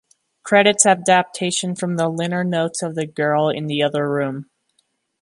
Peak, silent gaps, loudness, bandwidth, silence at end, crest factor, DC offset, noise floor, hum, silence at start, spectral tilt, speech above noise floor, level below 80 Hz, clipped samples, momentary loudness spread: 0 dBFS; none; -18 LUFS; 11.5 kHz; 0.8 s; 20 dB; under 0.1%; -67 dBFS; none; 0.45 s; -3.5 dB/octave; 49 dB; -68 dBFS; under 0.1%; 11 LU